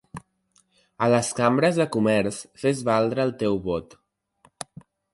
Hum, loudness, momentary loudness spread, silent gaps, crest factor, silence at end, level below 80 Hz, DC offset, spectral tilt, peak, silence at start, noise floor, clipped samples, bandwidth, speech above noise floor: none; -23 LUFS; 19 LU; none; 18 dB; 1.3 s; -56 dBFS; under 0.1%; -5.5 dB/octave; -6 dBFS; 0.15 s; -65 dBFS; under 0.1%; 11.5 kHz; 43 dB